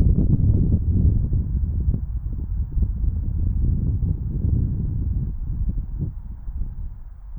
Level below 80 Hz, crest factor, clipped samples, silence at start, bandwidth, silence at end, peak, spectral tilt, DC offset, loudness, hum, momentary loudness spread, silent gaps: -24 dBFS; 16 dB; under 0.1%; 0 s; 1.6 kHz; 0 s; -6 dBFS; -14.5 dB/octave; under 0.1%; -24 LUFS; none; 14 LU; none